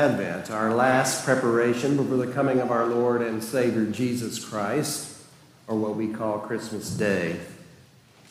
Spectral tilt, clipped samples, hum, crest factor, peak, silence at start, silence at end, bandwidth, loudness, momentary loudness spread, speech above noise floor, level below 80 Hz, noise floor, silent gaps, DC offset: -5 dB/octave; under 0.1%; none; 18 dB; -8 dBFS; 0 s; 0.65 s; 16 kHz; -25 LUFS; 9 LU; 29 dB; -66 dBFS; -54 dBFS; none; under 0.1%